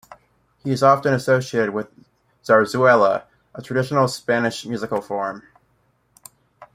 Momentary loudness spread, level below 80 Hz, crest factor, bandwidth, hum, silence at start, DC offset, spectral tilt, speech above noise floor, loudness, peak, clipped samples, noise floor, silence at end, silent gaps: 18 LU; -62 dBFS; 20 dB; 16 kHz; none; 0.65 s; under 0.1%; -5.5 dB/octave; 45 dB; -19 LUFS; -2 dBFS; under 0.1%; -64 dBFS; 0.1 s; none